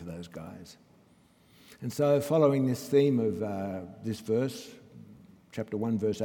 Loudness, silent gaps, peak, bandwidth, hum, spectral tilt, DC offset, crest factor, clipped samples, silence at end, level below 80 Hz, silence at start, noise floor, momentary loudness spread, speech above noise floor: -29 LUFS; none; -10 dBFS; 18 kHz; none; -7 dB/octave; under 0.1%; 20 dB; under 0.1%; 0 s; -70 dBFS; 0 s; -62 dBFS; 19 LU; 33 dB